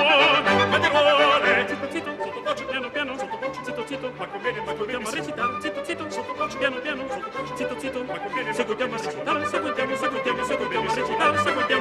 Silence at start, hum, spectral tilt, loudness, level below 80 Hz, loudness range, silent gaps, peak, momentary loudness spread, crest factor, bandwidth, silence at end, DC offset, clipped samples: 0 s; none; -3.5 dB/octave; -24 LUFS; -58 dBFS; 7 LU; none; -6 dBFS; 13 LU; 18 dB; 13.5 kHz; 0 s; under 0.1%; under 0.1%